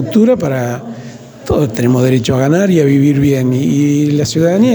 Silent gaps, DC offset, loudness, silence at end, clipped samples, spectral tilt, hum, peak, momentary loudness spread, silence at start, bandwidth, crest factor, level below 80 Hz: none; under 0.1%; -12 LUFS; 0 s; under 0.1%; -7 dB/octave; none; 0 dBFS; 13 LU; 0 s; over 20 kHz; 12 dB; -40 dBFS